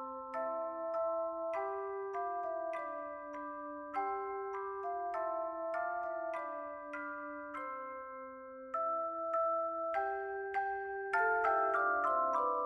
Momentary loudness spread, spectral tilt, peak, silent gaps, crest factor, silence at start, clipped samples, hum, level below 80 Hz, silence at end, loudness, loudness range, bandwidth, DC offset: 12 LU; -5.5 dB/octave; -20 dBFS; none; 16 dB; 0 s; under 0.1%; none; -74 dBFS; 0 s; -37 LUFS; 7 LU; 9.4 kHz; under 0.1%